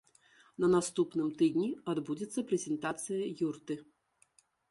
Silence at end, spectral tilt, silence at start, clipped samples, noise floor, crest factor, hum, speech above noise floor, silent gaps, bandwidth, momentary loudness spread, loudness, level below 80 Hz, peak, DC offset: 0.9 s; -5.5 dB/octave; 0.6 s; under 0.1%; -70 dBFS; 18 dB; none; 37 dB; none; 11.5 kHz; 10 LU; -34 LUFS; -74 dBFS; -16 dBFS; under 0.1%